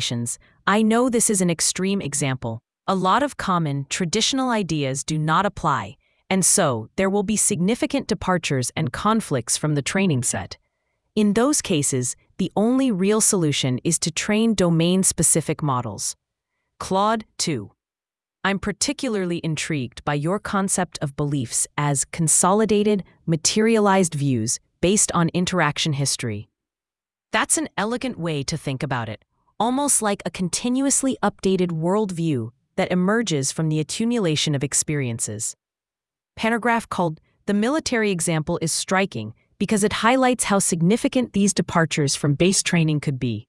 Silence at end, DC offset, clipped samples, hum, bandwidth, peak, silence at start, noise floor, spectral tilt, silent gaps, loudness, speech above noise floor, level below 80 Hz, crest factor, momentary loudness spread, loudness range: 0.05 s; under 0.1%; under 0.1%; none; 12 kHz; -2 dBFS; 0 s; under -90 dBFS; -4 dB/octave; none; -21 LUFS; over 69 dB; -52 dBFS; 18 dB; 9 LU; 5 LU